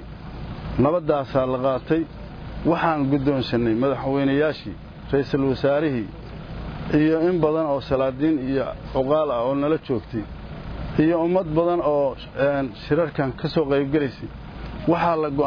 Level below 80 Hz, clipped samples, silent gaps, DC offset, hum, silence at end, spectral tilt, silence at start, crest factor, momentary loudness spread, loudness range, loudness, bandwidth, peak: -40 dBFS; under 0.1%; none; under 0.1%; none; 0 s; -9 dB/octave; 0 s; 16 dB; 15 LU; 2 LU; -22 LUFS; 5.4 kHz; -6 dBFS